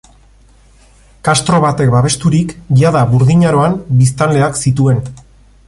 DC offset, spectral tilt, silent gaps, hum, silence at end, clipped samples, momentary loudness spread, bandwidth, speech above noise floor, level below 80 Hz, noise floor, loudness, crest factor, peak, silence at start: under 0.1%; -6 dB/octave; none; none; 0.5 s; under 0.1%; 4 LU; 11.5 kHz; 34 dB; -38 dBFS; -45 dBFS; -12 LUFS; 12 dB; 0 dBFS; 1.25 s